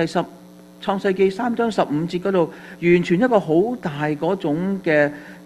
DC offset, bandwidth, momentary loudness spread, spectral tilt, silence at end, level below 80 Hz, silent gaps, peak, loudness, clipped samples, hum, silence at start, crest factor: under 0.1%; 12.5 kHz; 8 LU; -7 dB/octave; 0 s; -56 dBFS; none; -2 dBFS; -20 LUFS; under 0.1%; none; 0 s; 18 dB